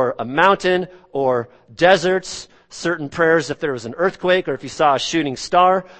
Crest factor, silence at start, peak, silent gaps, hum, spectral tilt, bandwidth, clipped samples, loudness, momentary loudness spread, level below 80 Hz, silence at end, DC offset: 18 dB; 0 s; 0 dBFS; none; none; -4.5 dB/octave; 8.8 kHz; under 0.1%; -18 LUFS; 11 LU; -54 dBFS; 0.05 s; under 0.1%